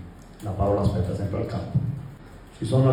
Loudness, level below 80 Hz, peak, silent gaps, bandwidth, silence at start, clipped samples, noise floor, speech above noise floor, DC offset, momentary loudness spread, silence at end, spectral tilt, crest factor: -26 LUFS; -42 dBFS; -10 dBFS; none; 11.5 kHz; 0 s; under 0.1%; -44 dBFS; 21 dB; under 0.1%; 20 LU; 0 s; -8.5 dB/octave; 16 dB